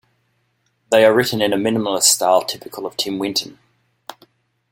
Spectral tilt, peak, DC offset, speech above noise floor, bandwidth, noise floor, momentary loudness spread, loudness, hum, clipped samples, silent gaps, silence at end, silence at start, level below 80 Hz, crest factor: -2.5 dB/octave; 0 dBFS; under 0.1%; 49 dB; 16.5 kHz; -66 dBFS; 14 LU; -17 LUFS; none; under 0.1%; none; 0.6 s; 0.9 s; -62 dBFS; 20 dB